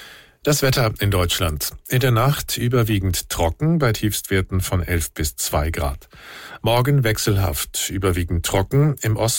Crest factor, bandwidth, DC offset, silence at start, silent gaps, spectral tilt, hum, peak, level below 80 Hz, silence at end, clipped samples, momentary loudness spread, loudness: 12 dB; 17 kHz; under 0.1%; 0 s; none; -4.5 dB/octave; none; -8 dBFS; -34 dBFS; 0 s; under 0.1%; 7 LU; -20 LUFS